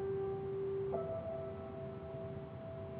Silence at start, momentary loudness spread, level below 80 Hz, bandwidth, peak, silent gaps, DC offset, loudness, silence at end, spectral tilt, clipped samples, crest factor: 0 s; 7 LU; -62 dBFS; 4.3 kHz; -26 dBFS; none; under 0.1%; -42 LUFS; 0 s; -8.5 dB/octave; under 0.1%; 16 dB